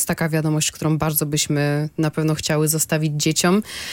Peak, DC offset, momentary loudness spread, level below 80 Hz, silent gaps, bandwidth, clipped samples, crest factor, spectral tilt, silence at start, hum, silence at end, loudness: -6 dBFS; under 0.1%; 4 LU; -50 dBFS; none; 17 kHz; under 0.1%; 14 dB; -4.5 dB/octave; 0 s; none; 0 s; -20 LUFS